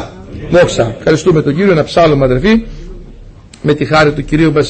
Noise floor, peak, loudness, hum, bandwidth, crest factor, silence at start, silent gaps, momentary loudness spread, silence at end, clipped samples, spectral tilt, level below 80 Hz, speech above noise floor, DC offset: -34 dBFS; 0 dBFS; -11 LUFS; none; 8.8 kHz; 12 dB; 0 s; none; 12 LU; 0 s; under 0.1%; -6.5 dB/octave; -30 dBFS; 25 dB; under 0.1%